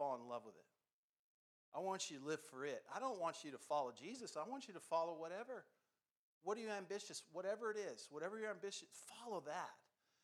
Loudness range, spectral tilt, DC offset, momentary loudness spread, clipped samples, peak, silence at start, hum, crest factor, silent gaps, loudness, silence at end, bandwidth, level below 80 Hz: 2 LU; -3 dB/octave; under 0.1%; 9 LU; under 0.1%; -30 dBFS; 0 s; none; 20 dB; 0.93-1.72 s, 6.11-6.41 s; -48 LUFS; 0.5 s; 13.5 kHz; under -90 dBFS